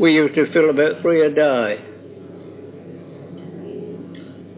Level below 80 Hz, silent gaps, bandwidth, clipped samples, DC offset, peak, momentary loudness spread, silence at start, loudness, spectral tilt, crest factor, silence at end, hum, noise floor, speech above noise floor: -66 dBFS; none; 4 kHz; under 0.1%; under 0.1%; -2 dBFS; 22 LU; 0 s; -17 LUFS; -10 dB/octave; 16 dB; 0.05 s; none; -38 dBFS; 22 dB